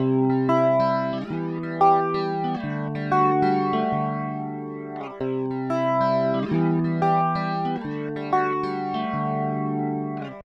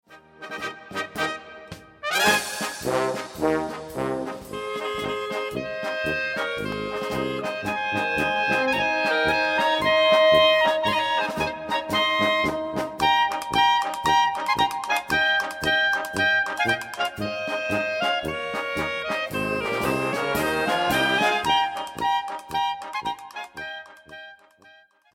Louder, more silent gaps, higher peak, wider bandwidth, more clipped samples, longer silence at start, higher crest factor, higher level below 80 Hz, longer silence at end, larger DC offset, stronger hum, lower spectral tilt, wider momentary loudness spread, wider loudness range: about the same, -24 LUFS vs -23 LUFS; neither; about the same, -6 dBFS vs -6 dBFS; second, 7.2 kHz vs 16.5 kHz; neither; about the same, 0 s vs 0.1 s; about the same, 16 dB vs 18 dB; second, -60 dBFS vs -54 dBFS; second, 0 s vs 0.8 s; neither; neither; first, -9 dB/octave vs -3 dB/octave; about the same, 10 LU vs 12 LU; second, 2 LU vs 8 LU